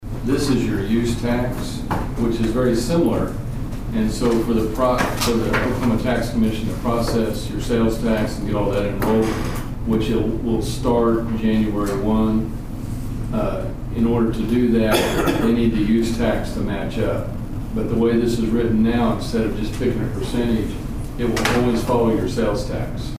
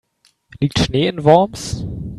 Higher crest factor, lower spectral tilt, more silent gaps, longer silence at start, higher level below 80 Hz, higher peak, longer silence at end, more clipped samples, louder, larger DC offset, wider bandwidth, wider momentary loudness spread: about the same, 16 dB vs 18 dB; about the same, -6.5 dB/octave vs -6 dB/octave; neither; second, 0 s vs 0.6 s; first, -30 dBFS vs -38 dBFS; second, -4 dBFS vs 0 dBFS; about the same, 0 s vs 0 s; neither; second, -21 LUFS vs -17 LUFS; first, 0.2% vs under 0.1%; first, 15.5 kHz vs 13 kHz; second, 8 LU vs 13 LU